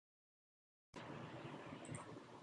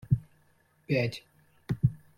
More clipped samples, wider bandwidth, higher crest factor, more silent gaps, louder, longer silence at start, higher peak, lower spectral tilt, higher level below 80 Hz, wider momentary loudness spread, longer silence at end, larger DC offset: neither; second, 11 kHz vs 13.5 kHz; about the same, 18 dB vs 20 dB; neither; second, -54 LUFS vs -31 LUFS; first, 0.95 s vs 0.1 s; second, -38 dBFS vs -12 dBFS; second, -5 dB/octave vs -8 dB/octave; second, -78 dBFS vs -52 dBFS; second, 5 LU vs 14 LU; second, 0 s vs 0.2 s; neither